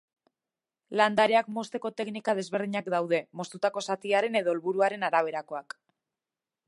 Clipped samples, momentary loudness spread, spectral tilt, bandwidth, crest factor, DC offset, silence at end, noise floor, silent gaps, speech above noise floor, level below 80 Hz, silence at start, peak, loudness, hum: under 0.1%; 12 LU; -4.5 dB/octave; 11.5 kHz; 22 dB; under 0.1%; 1.05 s; under -90 dBFS; none; over 62 dB; -80 dBFS; 0.9 s; -8 dBFS; -28 LUFS; none